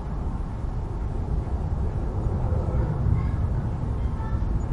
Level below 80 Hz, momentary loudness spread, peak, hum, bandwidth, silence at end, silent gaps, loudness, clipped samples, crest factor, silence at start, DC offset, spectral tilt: -28 dBFS; 7 LU; -12 dBFS; none; 7.4 kHz; 0 s; none; -28 LUFS; under 0.1%; 14 dB; 0 s; under 0.1%; -9.5 dB/octave